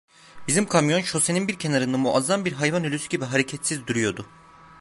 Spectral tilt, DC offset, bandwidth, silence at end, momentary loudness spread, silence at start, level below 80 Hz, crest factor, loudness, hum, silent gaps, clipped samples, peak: -4 dB/octave; under 0.1%; 12 kHz; 0 s; 7 LU; 0.35 s; -60 dBFS; 20 dB; -23 LUFS; none; none; under 0.1%; -4 dBFS